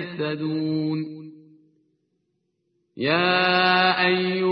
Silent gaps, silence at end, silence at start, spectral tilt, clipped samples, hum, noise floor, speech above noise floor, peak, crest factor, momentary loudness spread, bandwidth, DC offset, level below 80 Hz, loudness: none; 0 s; 0 s; -9.5 dB/octave; under 0.1%; none; -74 dBFS; 52 dB; -6 dBFS; 16 dB; 11 LU; 5.6 kHz; under 0.1%; -66 dBFS; -21 LUFS